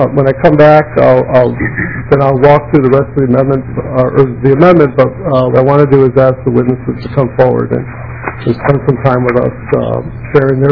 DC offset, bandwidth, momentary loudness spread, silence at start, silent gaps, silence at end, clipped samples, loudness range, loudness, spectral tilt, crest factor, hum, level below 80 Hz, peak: under 0.1%; 5.4 kHz; 10 LU; 0 s; none; 0 s; 4%; 4 LU; -9 LUFS; -10.5 dB/octave; 8 dB; none; -32 dBFS; 0 dBFS